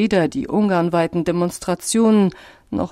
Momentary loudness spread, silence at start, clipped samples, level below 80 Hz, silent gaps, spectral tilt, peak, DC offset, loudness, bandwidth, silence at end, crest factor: 8 LU; 0 s; under 0.1%; -50 dBFS; none; -5.5 dB/octave; -6 dBFS; under 0.1%; -19 LUFS; 15 kHz; 0.05 s; 12 dB